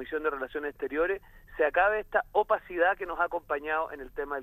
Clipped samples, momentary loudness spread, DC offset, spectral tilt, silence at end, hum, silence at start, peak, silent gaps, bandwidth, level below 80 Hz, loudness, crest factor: under 0.1%; 10 LU; under 0.1%; -6 dB/octave; 0 s; none; 0 s; -12 dBFS; none; 15 kHz; -54 dBFS; -29 LUFS; 18 dB